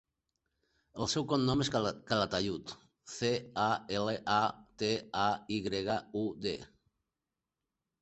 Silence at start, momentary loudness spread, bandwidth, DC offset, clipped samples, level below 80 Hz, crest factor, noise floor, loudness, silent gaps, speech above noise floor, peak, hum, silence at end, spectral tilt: 0.95 s; 8 LU; 8.2 kHz; under 0.1%; under 0.1%; -62 dBFS; 22 dB; -90 dBFS; -34 LUFS; none; 56 dB; -14 dBFS; none; 1.35 s; -4.5 dB/octave